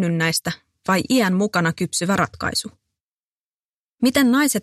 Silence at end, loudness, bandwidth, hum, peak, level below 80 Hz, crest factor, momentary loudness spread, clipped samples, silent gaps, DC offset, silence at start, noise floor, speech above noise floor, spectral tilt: 0 s; -20 LUFS; 15 kHz; none; -4 dBFS; -54 dBFS; 18 dB; 9 LU; under 0.1%; 3.00-3.98 s; under 0.1%; 0 s; under -90 dBFS; over 71 dB; -4 dB/octave